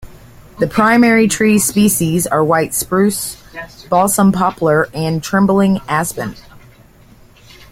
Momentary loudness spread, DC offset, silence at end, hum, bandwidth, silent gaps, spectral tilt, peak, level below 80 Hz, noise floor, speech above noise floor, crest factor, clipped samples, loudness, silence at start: 11 LU; under 0.1%; 1.15 s; none; 16.5 kHz; none; -5 dB/octave; 0 dBFS; -44 dBFS; -44 dBFS; 30 dB; 14 dB; under 0.1%; -14 LUFS; 0 s